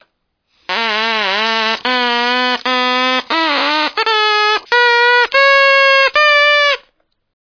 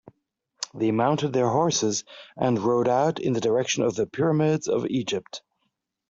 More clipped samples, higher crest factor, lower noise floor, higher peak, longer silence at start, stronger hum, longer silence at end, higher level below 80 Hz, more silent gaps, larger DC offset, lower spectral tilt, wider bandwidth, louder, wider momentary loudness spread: neither; about the same, 12 dB vs 16 dB; second, -66 dBFS vs -77 dBFS; first, 0 dBFS vs -8 dBFS; about the same, 0.7 s vs 0.6 s; neither; about the same, 0.7 s vs 0.7 s; first, -60 dBFS vs -66 dBFS; neither; neither; second, -1 dB/octave vs -5 dB/octave; second, 5.4 kHz vs 8 kHz; first, -11 LUFS vs -24 LUFS; second, 6 LU vs 10 LU